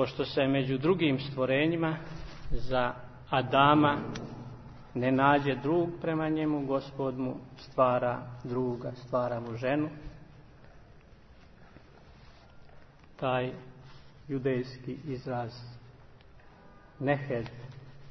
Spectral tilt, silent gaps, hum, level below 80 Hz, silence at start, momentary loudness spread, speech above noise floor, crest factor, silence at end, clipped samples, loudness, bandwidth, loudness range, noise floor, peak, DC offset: -8 dB/octave; none; none; -52 dBFS; 0 s; 19 LU; 25 dB; 22 dB; 0 s; under 0.1%; -30 LUFS; 6.4 kHz; 11 LU; -54 dBFS; -8 dBFS; under 0.1%